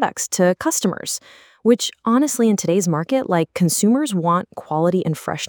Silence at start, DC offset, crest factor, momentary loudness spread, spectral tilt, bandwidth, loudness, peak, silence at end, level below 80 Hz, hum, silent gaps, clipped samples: 0 s; under 0.1%; 16 dB; 6 LU; -5 dB/octave; over 20 kHz; -19 LUFS; -4 dBFS; 0 s; -64 dBFS; none; none; under 0.1%